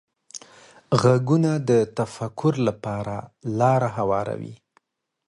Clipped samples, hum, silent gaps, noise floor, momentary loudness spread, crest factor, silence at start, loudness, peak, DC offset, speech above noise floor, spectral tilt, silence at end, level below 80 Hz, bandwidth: under 0.1%; none; none; -66 dBFS; 19 LU; 18 dB; 0.35 s; -23 LUFS; -6 dBFS; under 0.1%; 44 dB; -7 dB/octave; 0.75 s; -56 dBFS; 11.5 kHz